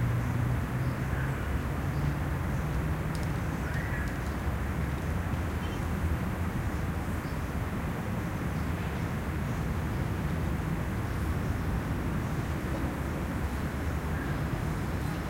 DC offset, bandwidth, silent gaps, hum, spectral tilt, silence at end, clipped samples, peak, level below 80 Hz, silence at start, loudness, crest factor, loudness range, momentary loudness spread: under 0.1%; 16 kHz; none; none; -7 dB/octave; 0 s; under 0.1%; -18 dBFS; -38 dBFS; 0 s; -32 LUFS; 12 dB; 1 LU; 2 LU